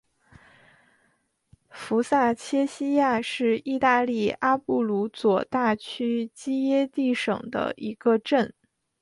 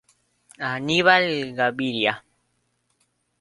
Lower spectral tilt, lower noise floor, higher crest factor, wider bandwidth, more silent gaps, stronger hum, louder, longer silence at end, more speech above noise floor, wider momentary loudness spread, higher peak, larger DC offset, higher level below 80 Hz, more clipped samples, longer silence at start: about the same, -5.5 dB/octave vs -4.5 dB/octave; about the same, -70 dBFS vs -71 dBFS; second, 18 dB vs 24 dB; about the same, 11.5 kHz vs 11.5 kHz; neither; second, none vs 60 Hz at -55 dBFS; second, -25 LUFS vs -21 LUFS; second, 0.5 s vs 1.2 s; second, 45 dB vs 49 dB; second, 6 LU vs 13 LU; second, -8 dBFS vs -2 dBFS; neither; about the same, -66 dBFS vs -64 dBFS; neither; first, 1.75 s vs 0.6 s